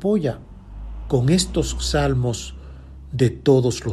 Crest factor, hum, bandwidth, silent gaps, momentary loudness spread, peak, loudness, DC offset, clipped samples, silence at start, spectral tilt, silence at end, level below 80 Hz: 18 dB; none; 12.5 kHz; none; 22 LU; -4 dBFS; -20 LUFS; under 0.1%; under 0.1%; 0 s; -5.5 dB/octave; 0 s; -34 dBFS